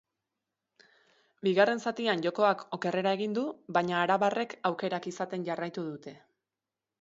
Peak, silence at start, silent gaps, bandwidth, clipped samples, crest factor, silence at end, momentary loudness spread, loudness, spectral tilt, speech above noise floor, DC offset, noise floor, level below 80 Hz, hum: -10 dBFS; 1.45 s; none; 8 kHz; under 0.1%; 22 dB; 0.85 s; 10 LU; -30 LUFS; -5.5 dB/octave; over 60 dB; under 0.1%; under -90 dBFS; -80 dBFS; none